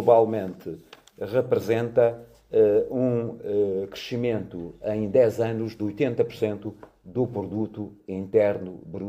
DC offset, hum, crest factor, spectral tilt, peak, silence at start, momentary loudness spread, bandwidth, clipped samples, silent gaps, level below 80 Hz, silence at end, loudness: under 0.1%; none; 20 dB; -8 dB/octave; -4 dBFS; 0 s; 15 LU; 15.5 kHz; under 0.1%; none; -60 dBFS; 0 s; -25 LUFS